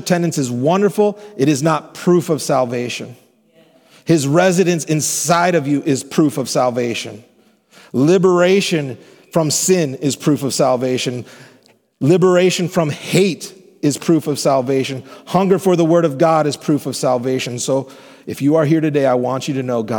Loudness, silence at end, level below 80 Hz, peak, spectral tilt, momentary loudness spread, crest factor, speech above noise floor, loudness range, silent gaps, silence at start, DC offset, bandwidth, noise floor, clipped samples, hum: -16 LUFS; 0 s; -66 dBFS; -2 dBFS; -5 dB/octave; 10 LU; 16 dB; 36 dB; 2 LU; none; 0 s; under 0.1%; 19 kHz; -52 dBFS; under 0.1%; none